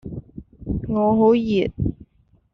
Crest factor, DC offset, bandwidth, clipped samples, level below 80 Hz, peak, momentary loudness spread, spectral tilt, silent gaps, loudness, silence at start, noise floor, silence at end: 16 dB; under 0.1%; 6.2 kHz; under 0.1%; -40 dBFS; -6 dBFS; 19 LU; -7 dB/octave; none; -20 LUFS; 0.05 s; -58 dBFS; 0.6 s